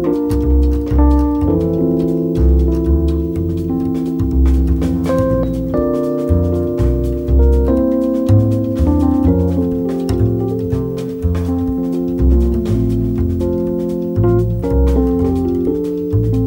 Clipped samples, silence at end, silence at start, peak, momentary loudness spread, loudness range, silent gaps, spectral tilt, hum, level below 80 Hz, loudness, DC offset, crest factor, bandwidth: under 0.1%; 0 s; 0 s; -2 dBFS; 5 LU; 2 LU; none; -10 dB/octave; none; -18 dBFS; -16 LUFS; under 0.1%; 12 dB; 16.5 kHz